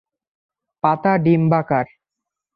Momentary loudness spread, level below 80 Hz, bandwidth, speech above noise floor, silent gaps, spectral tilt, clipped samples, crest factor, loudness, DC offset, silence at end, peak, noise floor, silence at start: 6 LU; -60 dBFS; 5.2 kHz; 67 dB; none; -11 dB/octave; under 0.1%; 16 dB; -18 LUFS; under 0.1%; 0.7 s; -4 dBFS; -84 dBFS; 0.85 s